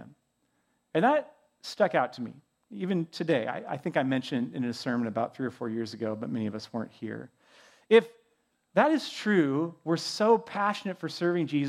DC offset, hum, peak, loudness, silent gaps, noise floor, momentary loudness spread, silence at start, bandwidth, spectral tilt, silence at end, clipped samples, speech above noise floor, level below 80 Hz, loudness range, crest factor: under 0.1%; none; -8 dBFS; -29 LUFS; none; -74 dBFS; 13 LU; 0 s; 13.5 kHz; -6 dB/octave; 0 s; under 0.1%; 46 dB; -80 dBFS; 6 LU; 22 dB